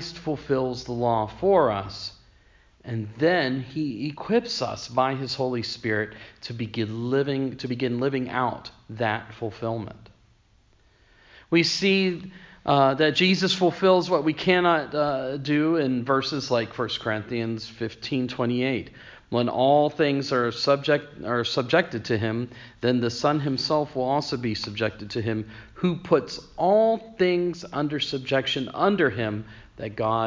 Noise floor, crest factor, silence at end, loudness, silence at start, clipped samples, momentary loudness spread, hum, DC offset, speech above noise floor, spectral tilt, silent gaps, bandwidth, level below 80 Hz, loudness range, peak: -60 dBFS; 18 dB; 0 s; -25 LUFS; 0 s; under 0.1%; 12 LU; none; under 0.1%; 36 dB; -5.5 dB/octave; none; 7.6 kHz; -56 dBFS; 6 LU; -6 dBFS